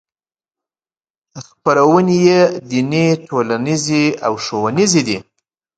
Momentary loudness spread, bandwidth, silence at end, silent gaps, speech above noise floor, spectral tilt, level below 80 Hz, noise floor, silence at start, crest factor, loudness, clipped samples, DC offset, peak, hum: 8 LU; 9.2 kHz; 0.55 s; none; over 76 dB; -5 dB/octave; -58 dBFS; under -90 dBFS; 1.35 s; 16 dB; -15 LUFS; under 0.1%; under 0.1%; 0 dBFS; none